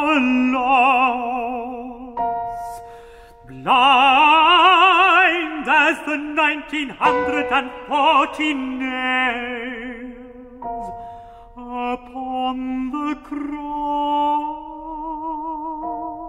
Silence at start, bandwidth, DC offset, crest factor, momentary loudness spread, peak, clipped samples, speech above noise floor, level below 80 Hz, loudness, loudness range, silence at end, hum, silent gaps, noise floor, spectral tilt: 0 s; 13.5 kHz; under 0.1%; 18 dB; 19 LU; -2 dBFS; under 0.1%; 22 dB; -50 dBFS; -18 LUFS; 13 LU; 0 s; none; none; -43 dBFS; -3.5 dB/octave